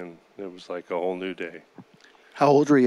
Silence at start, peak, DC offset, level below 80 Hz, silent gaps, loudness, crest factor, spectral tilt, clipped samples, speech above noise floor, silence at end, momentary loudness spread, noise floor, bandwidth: 0 s; -6 dBFS; under 0.1%; -82 dBFS; none; -25 LUFS; 18 dB; -6.5 dB/octave; under 0.1%; 31 dB; 0 s; 22 LU; -55 dBFS; 11 kHz